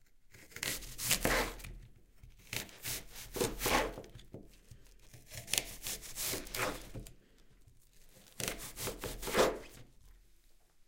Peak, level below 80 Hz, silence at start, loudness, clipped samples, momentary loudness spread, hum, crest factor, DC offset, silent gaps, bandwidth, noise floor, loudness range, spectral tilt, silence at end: -10 dBFS; -52 dBFS; 0.05 s; -36 LUFS; under 0.1%; 21 LU; none; 30 dB; under 0.1%; none; 17 kHz; -63 dBFS; 4 LU; -2 dB/octave; 0.05 s